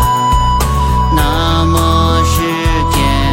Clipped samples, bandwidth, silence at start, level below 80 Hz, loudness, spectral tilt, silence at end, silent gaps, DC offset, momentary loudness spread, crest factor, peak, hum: under 0.1%; 16.5 kHz; 0 s; -16 dBFS; -12 LUFS; -5 dB/octave; 0 s; none; under 0.1%; 2 LU; 12 dB; 0 dBFS; none